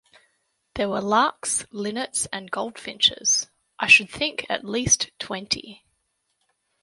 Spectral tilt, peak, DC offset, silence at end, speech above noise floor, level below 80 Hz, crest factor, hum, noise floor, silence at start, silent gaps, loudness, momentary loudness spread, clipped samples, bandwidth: -1 dB/octave; -2 dBFS; under 0.1%; 1.1 s; 50 dB; -54 dBFS; 24 dB; none; -73 dBFS; 0.75 s; none; -22 LUFS; 15 LU; under 0.1%; 11.5 kHz